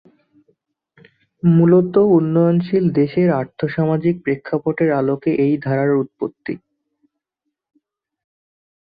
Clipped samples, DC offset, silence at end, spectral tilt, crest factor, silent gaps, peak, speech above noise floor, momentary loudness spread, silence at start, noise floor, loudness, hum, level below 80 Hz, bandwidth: under 0.1%; under 0.1%; 2.25 s; -12.5 dB/octave; 16 dB; none; -2 dBFS; 63 dB; 11 LU; 1.45 s; -79 dBFS; -17 LUFS; none; -58 dBFS; 5 kHz